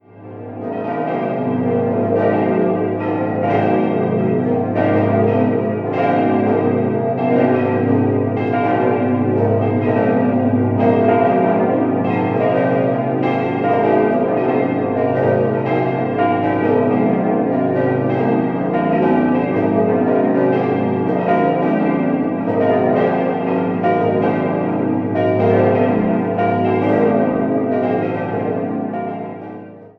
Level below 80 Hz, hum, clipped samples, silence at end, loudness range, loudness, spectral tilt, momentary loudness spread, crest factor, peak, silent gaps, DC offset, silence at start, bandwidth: -54 dBFS; none; under 0.1%; 0.1 s; 2 LU; -17 LUFS; -10.5 dB/octave; 5 LU; 14 dB; -2 dBFS; none; under 0.1%; 0.15 s; 5.2 kHz